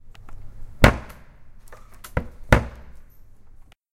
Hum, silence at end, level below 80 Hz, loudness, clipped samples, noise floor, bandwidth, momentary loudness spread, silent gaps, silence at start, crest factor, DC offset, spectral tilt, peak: none; 0.9 s; -30 dBFS; -22 LUFS; under 0.1%; -46 dBFS; 16.5 kHz; 23 LU; none; 0.05 s; 26 dB; under 0.1%; -6 dB/octave; 0 dBFS